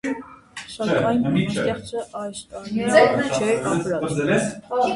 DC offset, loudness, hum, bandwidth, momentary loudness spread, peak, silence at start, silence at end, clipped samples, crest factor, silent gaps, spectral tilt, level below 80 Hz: under 0.1%; -21 LUFS; none; 11.5 kHz; 16 LU; -2 dBFS; 0.05 s; 0 s; under 0.1%; 20 dB; none; -5.5 dB/octave; -54 dBFS